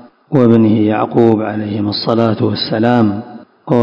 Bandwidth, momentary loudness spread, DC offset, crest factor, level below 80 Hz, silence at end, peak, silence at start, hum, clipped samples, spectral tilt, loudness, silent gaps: 5.6 kHz; 9 LU; under 0.1%; 12 dB; -50 dBFS; 0 s; 0 dBFS; 0.3 s; none; 0.9%; -9 dB/octave; -13 LUFS; none